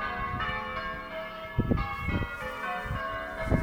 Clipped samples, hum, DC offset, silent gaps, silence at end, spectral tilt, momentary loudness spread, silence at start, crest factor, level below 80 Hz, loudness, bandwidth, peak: under 0.1%; none; under 0.1%; none; 0 s; -7 dB/octave; 6 LU; 0 s; 20 dB; -40 dBFS; -33 LUFS; 16.5 kHz; -12 dBFS